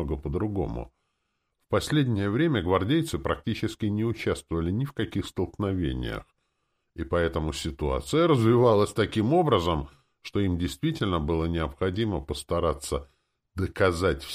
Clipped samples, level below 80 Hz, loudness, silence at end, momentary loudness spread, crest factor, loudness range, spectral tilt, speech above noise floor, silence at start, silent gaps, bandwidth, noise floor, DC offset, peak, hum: under 0.1%; -42 dBFS; -27 LUFS; 0 s; 11 LU; 18 dB; 6 LU; -6.5 dB/octave; 52 dB; 0 s; none; 15.5 kHz; -78 dBFS; under 0.1%; -10 dBFS; none